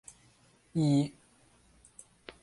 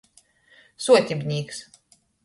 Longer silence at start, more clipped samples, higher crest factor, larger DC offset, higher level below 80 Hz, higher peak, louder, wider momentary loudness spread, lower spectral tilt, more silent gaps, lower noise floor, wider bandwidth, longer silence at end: about the same, 0.75 s vs 0.8 s; neither; about the same, 16 dB vs 20 dB; neither; about the same, -66 dBFS vs -66 dBFS; second, -18 dBFS vs -4 dBFS; second, -30 LUFS vs -22 LUFS; first, 26 LU vs 17 LU; first, -7 dB/octave vs -4.5 dB/octave; neither; first, -64 dBFS vs -60 dBFS; about the same, 11.5 kHz vs 11.5 kHz; first, 1.35 s vs 0.65 s